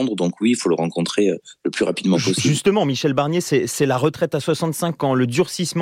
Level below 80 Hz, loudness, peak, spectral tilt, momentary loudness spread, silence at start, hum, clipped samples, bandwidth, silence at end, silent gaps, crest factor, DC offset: -60 dBFS; -20 LUFS; -4 dBFS; -5 dB/octave; 4 LU; 0 s; none; under 0.1%; 16.5 kHz; 0 s; none; 14 dB; under 0.1%